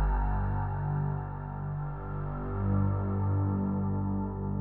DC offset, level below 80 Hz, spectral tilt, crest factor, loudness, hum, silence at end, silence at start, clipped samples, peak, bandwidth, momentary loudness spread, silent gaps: under 0.1%; -38 dBFS; -13.5 dB/octave; 12 dB; -32 LUFS; 50 Hz at -50 dBFS; 0 s; 0 s; under 0.1%; -18 dBFS; 2.9 kHz; 7 LU; none